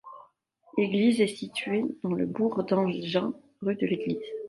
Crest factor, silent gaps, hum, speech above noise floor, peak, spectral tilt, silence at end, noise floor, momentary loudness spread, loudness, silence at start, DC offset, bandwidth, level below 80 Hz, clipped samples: 18 dB; none; none; 34 dB; -12 dBFS; -6.5 dB/octave; 0 s; -62 dBFS; 10 LU; -28 LUFS; 0.05 s; under 0.1%; 11.5 kHz; -70 dBFS; under 0.1%